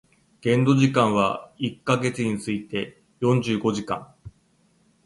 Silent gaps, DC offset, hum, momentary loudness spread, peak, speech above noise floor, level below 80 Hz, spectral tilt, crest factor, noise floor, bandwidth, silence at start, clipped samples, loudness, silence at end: none; under 0.1%; none; 12 LU; -6 dBFS; 40 dB; -58 dBFS; -6.5 dB/octave; 18 dB; -63 dBFS; 11.5 kHz; 0.45 s; under 0.1%; -23 LUFS; 0.75 s